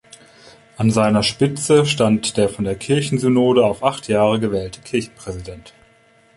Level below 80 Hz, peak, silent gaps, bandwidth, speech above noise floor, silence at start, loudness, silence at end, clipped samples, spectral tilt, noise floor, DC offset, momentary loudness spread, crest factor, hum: -48 dBFS; -2 dBFS; none; 11.5 kHz; 36 dB; 0.8 s; -18 LUFS; 0.7 s; under 0.1%; -5.5 dB/octave; -53 dBFS; under 0.1%; 11 LU; 16 dB; none